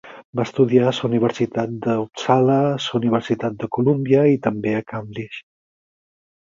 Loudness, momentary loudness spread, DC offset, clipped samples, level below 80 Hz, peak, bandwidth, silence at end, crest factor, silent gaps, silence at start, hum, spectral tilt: -20 LUFS; 14 LU; under 0.1%; under 0.1%; -58 dBFS; -2 dBFS; 7.6 kHz; 1.15 s; 18 dB; 0.25-0.33 s; 0.05 s; none; -7 dB/octave